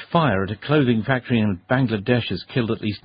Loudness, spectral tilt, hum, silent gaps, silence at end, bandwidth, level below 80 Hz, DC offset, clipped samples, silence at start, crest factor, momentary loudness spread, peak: -21 LUFS; -12 dB/octave; none; none; 0.05 s; 5.2 kHz; -52 dBFS; under 0.1%; under 0.1%; 0 s; 18 dB; 5 LU; -2 dBFS